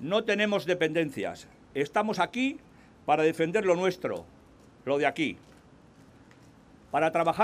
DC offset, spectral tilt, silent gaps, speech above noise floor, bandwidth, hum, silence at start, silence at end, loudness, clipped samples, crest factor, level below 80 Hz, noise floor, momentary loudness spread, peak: under 0.1%; -5 dB/octave; none; 28 dB; 15.5 kHz; none; 0 s; 0 s; -28 LUFS; under 0.1%; 18 dB; -66 dBFS; -55 dBFS; 13 LU; -10 dBFS